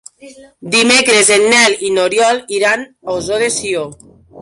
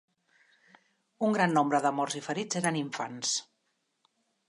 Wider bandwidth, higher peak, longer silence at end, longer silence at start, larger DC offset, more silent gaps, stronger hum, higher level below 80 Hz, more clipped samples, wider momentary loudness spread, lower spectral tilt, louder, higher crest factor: about the same, 11.5 kHz vs 11.5 kHz; first, 0 dBFS vs -12 dBFS; second, 0 s vs 1.05 s; second, 0.25 s vs 1.2 s; neither; neither; neither; first, -52 dBFS vs -82 dBFS; neither; first, 12 LU vs 8 LU; second, -1.5 dB/octave vs -4 dB/octave; first, -12 LUFS vs -29 LUFS; second, 14 dB vs 20 dB